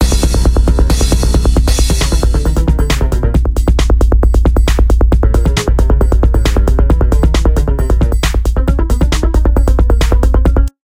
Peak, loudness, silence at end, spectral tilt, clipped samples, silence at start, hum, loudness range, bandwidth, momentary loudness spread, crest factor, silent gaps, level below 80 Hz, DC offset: 0 dBFS; -12 LUFS; 0.2 s; -6 dB/octave; under 0.1%; 0 s; none; 1 LU; 15 kHz; 2 LU; 10 dB; none; -10 dBFS; 0.4%